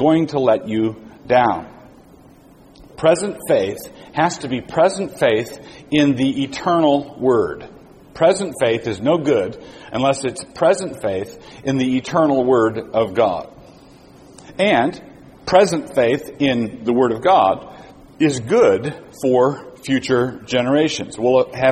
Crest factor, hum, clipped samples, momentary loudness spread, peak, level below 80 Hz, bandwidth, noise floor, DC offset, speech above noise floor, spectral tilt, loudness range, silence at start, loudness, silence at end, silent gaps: 18 dB; none; under 0.1%; 12 LU; 0 dBFS; -52 dBFS; 15 kHz; -46 dBFS; under 0.1%; 29 dB; -5.5 dB/octave; 3 LU; 0 s; -18 LUFS; 0 s; none